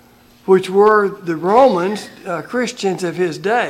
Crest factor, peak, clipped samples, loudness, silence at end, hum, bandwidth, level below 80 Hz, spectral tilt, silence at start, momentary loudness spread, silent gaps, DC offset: 14 dB; -2 dBFS; under 0.1%; -16 LUFS; 0 s; none; 13.5 kHz; -58 dBFS; -5.5 dB/octave; 0.45 s; 13 LU; none; under 0.1%